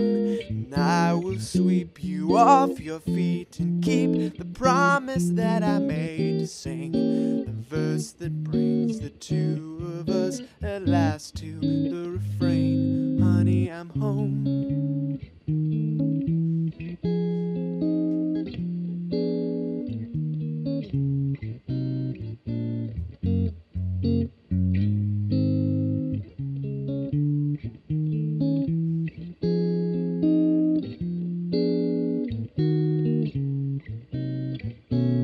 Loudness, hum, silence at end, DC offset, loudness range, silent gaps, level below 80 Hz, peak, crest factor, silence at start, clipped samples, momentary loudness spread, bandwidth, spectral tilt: -26 LUFS; none; 0 s; under 0.1%; 6 LU; none; -50 dBFS; -4 dBFS; 20 dB; 0 s; under 0.1%; 10 LU; 12 kHz; -7.5 dB/octave